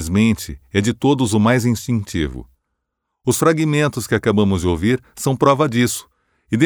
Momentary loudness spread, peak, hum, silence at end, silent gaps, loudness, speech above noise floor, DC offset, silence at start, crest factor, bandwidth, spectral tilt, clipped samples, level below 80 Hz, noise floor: 9 LU; -2 dBFS; none; 0 s; none; -18 LUFS; 60 dB; under 0.1%; 0 s; 16 dB; over 20 kHz; -5.5 dB/octave; under 0.1%; -40 dBFS; -77 dBFS